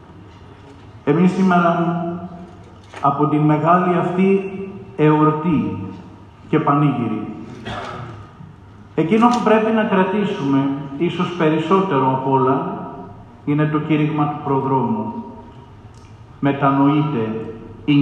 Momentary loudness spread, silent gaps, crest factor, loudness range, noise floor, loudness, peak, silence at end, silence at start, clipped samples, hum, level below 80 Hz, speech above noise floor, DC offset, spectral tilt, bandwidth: 17 LU; none; 18 dB; 4 LU; -41 dBFS; -18 LUFS; -2 dBFS; 0 s; 0.1 s; under 0.1%; none; -54 dBFS; 24 dB; under 0.1%; -8 dB/octave; 9.2 kHz